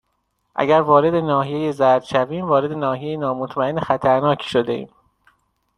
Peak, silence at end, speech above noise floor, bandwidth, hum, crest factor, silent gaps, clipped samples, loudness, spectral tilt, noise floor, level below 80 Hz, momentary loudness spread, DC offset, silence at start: -2 dBFS; 0.9 s; 52 dB; 11 kHz; none; 18 dB; none; under 0.1%; -19 LUFS; -7 dB/octave; -70 dBFS; -56 dBFS; 8 LU; under 0.1%; 0.55 s